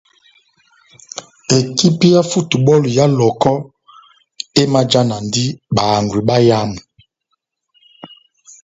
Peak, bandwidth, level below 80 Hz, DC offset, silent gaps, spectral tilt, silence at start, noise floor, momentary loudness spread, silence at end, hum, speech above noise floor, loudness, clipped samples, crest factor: 0 dBFS; 8 kHz; -50 dBFS; under 0.1%; none; -5.5 dB/octave; 1.15 s; -71 dBFS; 17 LU; 0.55 s; none; 57 dB; -14 LUFS; under 0.1%; 16 dB